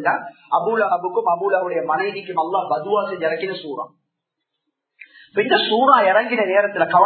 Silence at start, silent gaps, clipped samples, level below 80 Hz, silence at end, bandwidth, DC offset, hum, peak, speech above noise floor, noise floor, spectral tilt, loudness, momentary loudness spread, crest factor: 0 s; none; under 0.1%; -78 dBFS; 0 s; 4.5 kHz; under 0.1%; none; 0 dBFS; 60 dB; -79 dBFS; -8 dB/octave; -19 LUFS; 12 LU; 20 dB